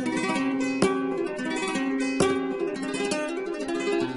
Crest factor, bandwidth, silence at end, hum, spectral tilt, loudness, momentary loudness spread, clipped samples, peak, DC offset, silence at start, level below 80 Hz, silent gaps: 20 dB; 11.5 kHz; 0 s; none; -4.5 dB/octave; -27 LUFS; 5 LU; under 0.1%; -8 dBFS; under 0.1%; 0 s; -60 dBFS; none